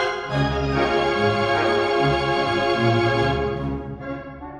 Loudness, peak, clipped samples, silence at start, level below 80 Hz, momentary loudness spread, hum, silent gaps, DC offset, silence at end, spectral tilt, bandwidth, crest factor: -21 LUFS; -6 dBFS; under 0.1%; 0 s; -38 dBFS; 11 LU; none; none; under 0.1%; 0 s; -6 dB/octave; 10.5 kHz; 16 dB